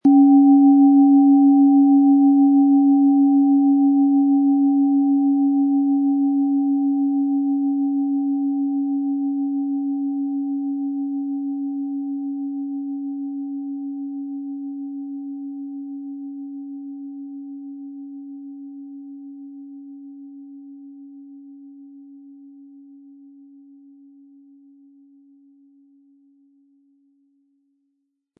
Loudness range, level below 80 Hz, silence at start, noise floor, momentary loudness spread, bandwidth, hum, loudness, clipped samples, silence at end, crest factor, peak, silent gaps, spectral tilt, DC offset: 23 LU; -86 dBFS; 0.05 s; -74 dBFS; 24 LU; 0.9 kHz; none; -18 LUFS; under 0.1%; 6.1 s; 14 dB; -6 dBFS; none; -12 dB/octave; under 0.1%